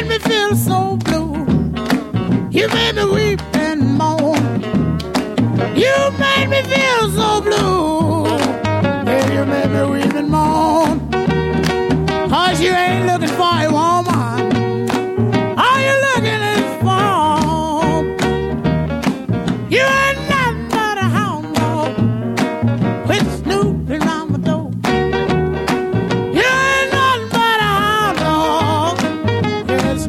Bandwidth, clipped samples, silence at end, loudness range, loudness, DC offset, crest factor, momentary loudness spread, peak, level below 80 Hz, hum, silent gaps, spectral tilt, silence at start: 16 kHz; under 0.1%; 0 s; 3 LU; -15 LUFS; under 0.1%; 14 dB; 5 LU; -2 dBFS; -36 dBFS; none; none; -5.5 dB/octave; 0 s